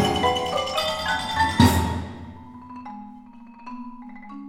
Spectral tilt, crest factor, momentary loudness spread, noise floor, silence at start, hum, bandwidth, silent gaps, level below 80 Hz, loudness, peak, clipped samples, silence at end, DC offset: -5 dB/octave; 22 dB; 23 LU; -44 dBFS; 0 s; none; 17 kHz; none; -42 dBFS; -22 LUFS; -2 dBFS; under 0.1%; 0 s; under 0.1%